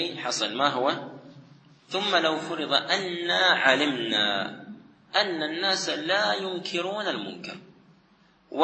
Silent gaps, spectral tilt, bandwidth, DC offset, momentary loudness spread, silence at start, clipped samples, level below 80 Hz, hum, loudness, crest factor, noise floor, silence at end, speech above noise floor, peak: none; -2.5 dB/octave; 8.8 kHz; under 0.1%; 15 LU; 0 s; under 0.1%; -80 dBFS; none; -25 LUFS; 24 dB; -61 dBFS; 0 s; 35 dB; -4 dBFS